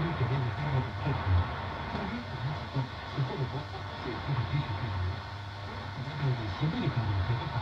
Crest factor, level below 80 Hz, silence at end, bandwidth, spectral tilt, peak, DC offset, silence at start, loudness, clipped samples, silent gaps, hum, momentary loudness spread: 14 dB; -50 dBFS; 0 s; 7.4 kHz; -7.5 dB/octave; -18 dBFS; under 0.1%; 0 s; -33 LUFS; under 0.1%; none; none; 8 LU